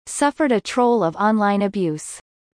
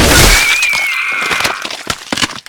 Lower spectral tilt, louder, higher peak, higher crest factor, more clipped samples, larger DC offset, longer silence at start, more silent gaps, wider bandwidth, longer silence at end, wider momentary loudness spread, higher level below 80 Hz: first, -5 dB/octave vs -2 dB/octave; second, -19 LUFS vs -11 LUFS; second, -4 dBFS vs 0 dBFS; about the same, 16 dB vs 12 dB; second, under 0.1% vs 0.4%; neither; about the same, 0.05 s vs 0 s; neither; second, 10.5 kHz vs over 20 kHz; first, 0.4 s vs 0.1 s; about the same, 12 LU vs 13 LU; second, -60 dBFS vs -22 dBFS